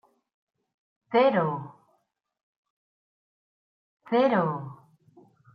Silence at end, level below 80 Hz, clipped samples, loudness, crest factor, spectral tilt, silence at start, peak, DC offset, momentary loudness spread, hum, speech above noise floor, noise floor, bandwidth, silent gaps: 0.8 s; -80 dBFS; under 0.1%; -25 LUFS; 20 dB; -9 dB/octave; 1.1 s; -10 dBFS; under 0.1%; 17 LU; none; 50 dB; -73 dBFS; 5.6 kHz; 2.43-2.63 s, 2.70-3.97 s